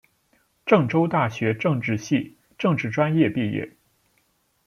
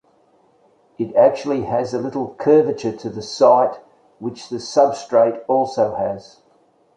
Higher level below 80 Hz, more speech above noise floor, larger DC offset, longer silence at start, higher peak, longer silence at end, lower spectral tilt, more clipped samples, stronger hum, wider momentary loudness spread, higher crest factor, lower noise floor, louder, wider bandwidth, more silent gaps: about the same, -62 dBFS vs -60 dBFS; first, 45 dB vs 39 dB; neither; second, 0.65 s vs 1 s; about the same, -4 dBFS vs -2 dBFS; first, 1 s vs 0.75 s; about the same, -7 dB/octave vs -6 dB/octave; neither; neither; second, 10 LU vs 14 LU; about the same, 20 dB vs 18 dB; first, -67 dBFS vs -57 dBFS; second, -23 LUFS vs -18 LUFS; first, 11 kHz vs 9.2 kHz; neither